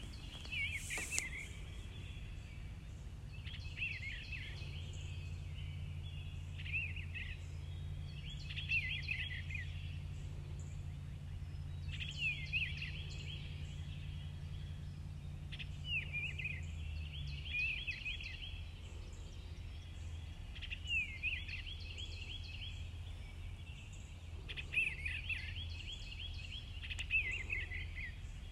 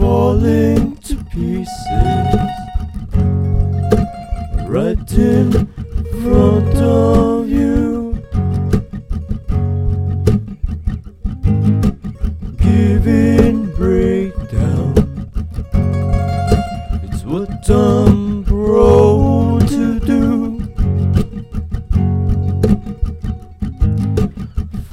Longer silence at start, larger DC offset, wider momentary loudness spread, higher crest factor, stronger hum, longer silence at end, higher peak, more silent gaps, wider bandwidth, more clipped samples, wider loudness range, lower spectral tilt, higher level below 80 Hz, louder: about the same, 0 s vs 0 s; neither; about the same, 13 LU vs 13 LU; first, 30 dB vs 14 dB; neither; about the same, 0 s vs 0 s; second, -14 dBFS vs 0 dBFS; neither; about the same, 14 kHz vs 14 kHz; neither; about the same, 4 LU vs 5 LU; second, -3.5 dB/octave vs -8.5 dB/octave; second, -52 dBFS vs -22 dBFS; second, -43 LUFS vs -16 LUFS